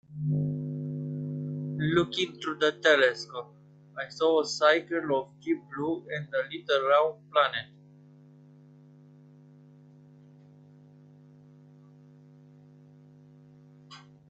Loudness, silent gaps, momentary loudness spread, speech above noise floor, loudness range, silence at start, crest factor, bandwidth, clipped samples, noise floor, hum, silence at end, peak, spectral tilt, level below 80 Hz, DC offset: -28 LUFS; none; 16 LU; 27 dB; 4 LU; 0.1 s; 22 dB; 8.2 kHz; under 0.1%; -54 dBFS; 50 Hz at -50 dBFS; 0.3 s; -8 dBFS; -5.5 dB/octave; -70 dBFS; under 0.1%